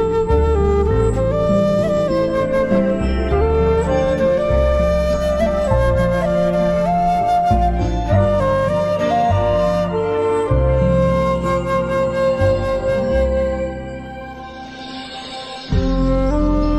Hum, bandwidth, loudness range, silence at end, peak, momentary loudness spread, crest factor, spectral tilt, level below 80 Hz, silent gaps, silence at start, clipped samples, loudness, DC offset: none; 11.5 kHz; 4 LU; 0 s; -2 dBFS; 12 LU; 14 dB; -7.5 dB/octave; -24 dBFS; none; 0 s; under 0.1%; -17 LUFS; under 0.1%